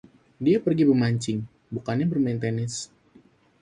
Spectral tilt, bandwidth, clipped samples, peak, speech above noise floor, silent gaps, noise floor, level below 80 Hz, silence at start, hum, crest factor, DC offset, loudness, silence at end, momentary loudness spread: -6.5 dB/octave; 11 kHz; under 0.1%; -10 dBFS; 34 dB; none; -57 dBFS; -60 dBFS; 0.4 s; none; 16 dB; under 0.1%; -25 LUFS; 0.75 s; 14 LU